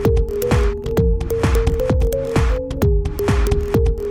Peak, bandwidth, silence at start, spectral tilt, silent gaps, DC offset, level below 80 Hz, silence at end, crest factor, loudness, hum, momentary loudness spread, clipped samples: -4 dBFS; 17 kHz; 0 s; -7 dB/octave; none; under 0.1%; -20 dBFS; 0 s; 12 dB; -19 LUFS; none; 2 LU; under 0.1%